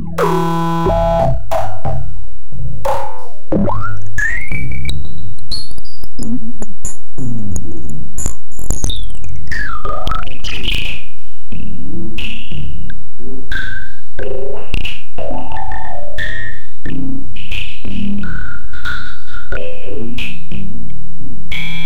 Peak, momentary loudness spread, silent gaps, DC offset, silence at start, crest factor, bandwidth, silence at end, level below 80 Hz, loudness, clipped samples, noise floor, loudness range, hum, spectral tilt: -2 dBFS; 16 LU; none; 70%; 0 s; 16 dB; 16.5 kHz; 0 s; -28 dBFS; -23 LUFS; under 0.1%; -38 dBFS; 7 LU; none; -5 dB/octave